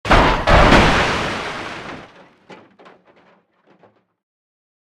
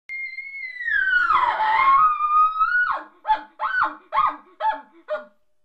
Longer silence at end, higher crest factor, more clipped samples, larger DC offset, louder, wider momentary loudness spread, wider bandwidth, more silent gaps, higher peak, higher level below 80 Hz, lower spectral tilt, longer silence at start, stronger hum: first, 2.4 s vs 0.4 s; about the same, 18 dB vs 16 dB; neither; neither; first, -14 LUFS vs -20 LUFS; first, 21 LU vs 15 LU; first, 12.5 kHz vs 8 kHz; neither; first, 0 dBFS vs -6 dBFS; first, -26 dBFS vs -54 dBFS; first, -5 dB/octave vs -3 dB/octave; about the same, 0.05 s vs 0.1 s; neither